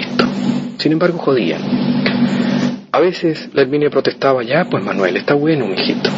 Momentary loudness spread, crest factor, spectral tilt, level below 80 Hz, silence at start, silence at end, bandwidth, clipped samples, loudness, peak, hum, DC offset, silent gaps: 4 LU; 16 dB; -6.5 dB/octave; -56 dBFS; 0 s; 0 s; 7.8 kHz; under 0.1%; -16 LUFS; 0 dBFS; none; under 0.1%; none